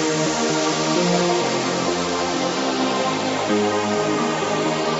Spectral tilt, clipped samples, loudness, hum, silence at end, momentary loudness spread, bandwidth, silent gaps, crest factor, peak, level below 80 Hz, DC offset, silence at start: -3.5 dB/octave; under 0.1%; -20 LUFS; none; 0 s; 3 LU; 8.2 kHz; none; 14 dB; -6 dBFS; -56 dBFS; under 0.1%; 0 s